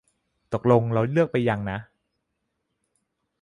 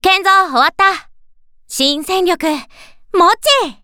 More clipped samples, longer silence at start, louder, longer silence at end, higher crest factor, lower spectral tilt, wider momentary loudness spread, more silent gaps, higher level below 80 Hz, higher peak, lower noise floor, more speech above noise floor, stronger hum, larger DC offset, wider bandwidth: neither; first, 0.5 s vs 0.05 s; second, -23 LUFS vs -13 LUFS; first, 1.6 s vs 0.1 s; first, 22 dB vs 14 dB; first, -9 dB/octave vs -1 dB/octave; about the same, 12 LU vs 11 LU; neither; second, -56 dBFS vs -48 dBFS; second, -4 dBFS vs 0 dBFS; first, -78 dBFS vs -44 dBFS; first, 56 dB vs 31 dB; neither; neither; second, 10 kHz vs 19 kHz